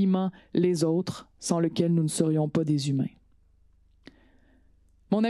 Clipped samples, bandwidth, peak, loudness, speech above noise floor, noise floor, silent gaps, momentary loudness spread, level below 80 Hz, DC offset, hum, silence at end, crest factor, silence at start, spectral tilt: under 0.1%; 12.5 kHz; -10 dBFS; -27 LUFS; 35 dB; -61 dBFS; none; 6 LU; -64 dBFS; under 0.1%; 50 Hz at -45 dBFS; 0 s; 18 dB; 0 s; -6.5 dB/octave